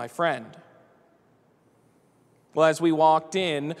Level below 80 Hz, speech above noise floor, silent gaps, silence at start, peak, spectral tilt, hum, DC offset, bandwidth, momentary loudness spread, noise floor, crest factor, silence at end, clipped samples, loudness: -76 dBFS; 39 dB; none; 0 s; -8 dBFS; -5 dB/octave; none; under 0.1%; 13.5 kHz; 9 LU; -62 dBFS; 20 dB; 0 s; under 0.1%; -23 LUFS